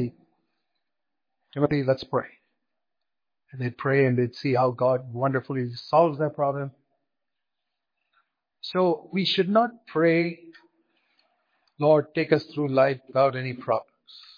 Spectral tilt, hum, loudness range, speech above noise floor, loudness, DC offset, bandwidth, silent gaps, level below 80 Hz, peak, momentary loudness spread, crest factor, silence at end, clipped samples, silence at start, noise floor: -8 dB/octave; none; 6 LU; 64 dB; -25 LUFS; under 0.1%; 5.2 kHz; none; -68 dBFS; -6 dBFS; 11 LU; 20 dB; 0.2 s; under 0.1%; 0 s; -88 dBFS